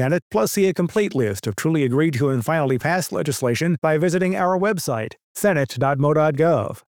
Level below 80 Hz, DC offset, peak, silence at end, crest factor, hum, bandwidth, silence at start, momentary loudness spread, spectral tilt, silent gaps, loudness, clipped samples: -60 dBFS; under 0.1%; -6 dBFS; 0.2 s; 14 dB; none; over 20 kHz; 0 s; 5 LU; -6 dB/octave; 0.22-0.31 s, 3.78-3.82 s, 5.23-5.35 s; -20 LUFS; under 0.1%